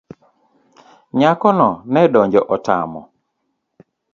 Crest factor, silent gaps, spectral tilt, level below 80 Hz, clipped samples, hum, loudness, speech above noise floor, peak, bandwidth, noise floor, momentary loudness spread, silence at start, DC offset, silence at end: 18 dB; none; -7.5 dB/octave; -58 dBFS; under 0.1%; none; -15 LUFS; 57 dB; 0 dBFS; 7.4 kHz; -72 dBFS; 11 LU; 1.15 s; under 0.1%; 1.1 s